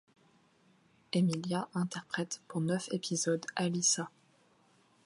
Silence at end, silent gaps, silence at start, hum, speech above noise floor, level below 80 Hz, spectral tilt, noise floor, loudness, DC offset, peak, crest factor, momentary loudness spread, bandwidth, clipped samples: 1 s; none; 1.15 s; none; 34 dB; -80 dBFS; -4 dB/octave; -68 dBFS; -33 LUFS; under 0.1%; -18 dBFS; 18 dB; 8 LU; 11.5 kHz; under 0.1%